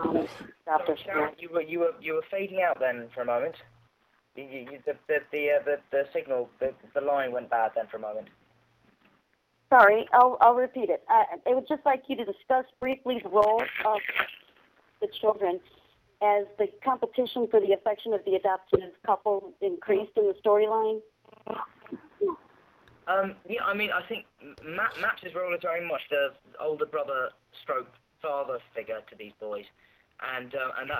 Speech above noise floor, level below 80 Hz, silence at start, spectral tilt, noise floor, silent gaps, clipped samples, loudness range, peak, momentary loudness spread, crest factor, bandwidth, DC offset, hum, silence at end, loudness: 44 dB; -68 dBFS; 0 s; -6.5 dB/octave; -71 dBFS; none; under 0.1%; 9 LU; -6 dBFS; 15 LU; 22 dB; 18 kHz; under 0.1%; none; 0 s; -28 LUFS